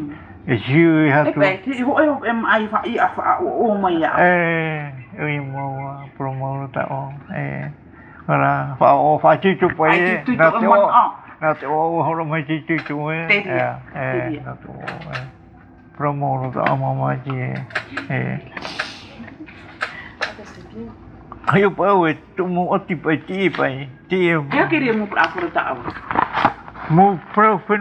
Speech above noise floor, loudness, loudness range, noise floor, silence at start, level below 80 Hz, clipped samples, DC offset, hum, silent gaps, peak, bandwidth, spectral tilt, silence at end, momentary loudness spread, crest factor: 26 dB; -18 LUFS; 10 LU; -44 dBFS; 0 s; -52 dBFS; under 0.1%; under 0.1%; none; none; 0 dBFS; 9 kHz; -8 dB/octave; 0 s; 16 LU; 18 dB